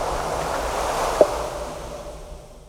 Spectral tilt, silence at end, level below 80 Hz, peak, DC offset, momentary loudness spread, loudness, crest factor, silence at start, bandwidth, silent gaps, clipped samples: -4 dB/octave; 0 s; -38 dBFS; 0 dBFS; under 0.1%; 18 LU; -24 LUFS; 24 dB; 0 s; 18.5 kHz; none; under 0.1%